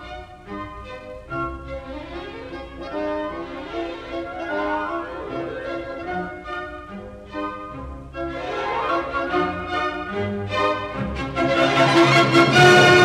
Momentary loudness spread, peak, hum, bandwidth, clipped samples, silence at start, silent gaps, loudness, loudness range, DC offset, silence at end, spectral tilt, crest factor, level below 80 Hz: 20 LU; -2 dBFS; none; 14 kHz; under 0.1%; 0 s; none; -21 LUFS; 12 LU; under 0.1%; 0 s; -5 dB/octave; 20 dB; -44 dBFS